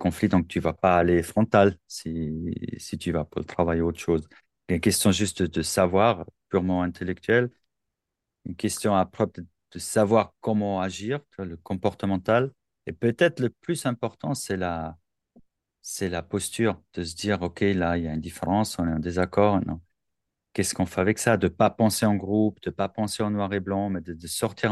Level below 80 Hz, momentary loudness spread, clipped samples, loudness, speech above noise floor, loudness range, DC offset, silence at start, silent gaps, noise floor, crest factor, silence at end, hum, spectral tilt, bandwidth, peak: -50 dBFS; 12 LU; under 0.1%; -25 LUFS; 60 dB; 4 LU; under 0.1%; 0 s; none; -85 dBFS; 20 dB; 0 s; none; -5.5 dB/octave; 12.5 kHz; -4 dBFS